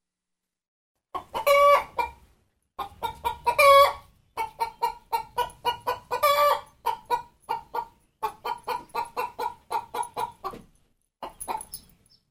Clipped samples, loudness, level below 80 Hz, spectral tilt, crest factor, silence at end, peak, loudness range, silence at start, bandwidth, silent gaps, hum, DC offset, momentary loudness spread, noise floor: under 0.1%; -25 LUFS; -56 dBFS; -1.5 dB/octave; 22 dB; 0.5 s; -6 dBFS; 12 LU; 1.15 s; 16 kHz; none; none; under 0.1%; 21 LU; -86 dBFS